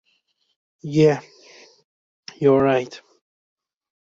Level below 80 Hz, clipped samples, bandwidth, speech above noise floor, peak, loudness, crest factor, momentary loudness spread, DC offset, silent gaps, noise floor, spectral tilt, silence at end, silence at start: -60 dBFS; under 0.1%; 7.6 kHz; 50 dB; -4 dBFS; -19 LUFS; 20 dB; 25 LU; under 0.1%; 1.84-2.23 s; -68 dBFS; -7 dB/octave; 1.15 s; 0.85 s